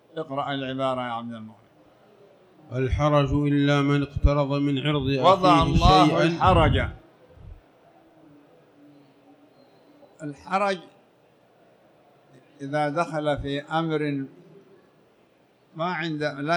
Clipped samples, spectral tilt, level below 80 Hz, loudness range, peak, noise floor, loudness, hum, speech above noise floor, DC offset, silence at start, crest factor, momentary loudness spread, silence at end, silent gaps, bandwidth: under 0.1%; -6.5 dB/octave; -36 dBFS; 13 LU; -6 dBFS; -60 dBFS; -23 LUFS; none; 38 dB; under 0.1%; 0.15 s; 20 dB; 15 LU; 0 s; none; 10 kHz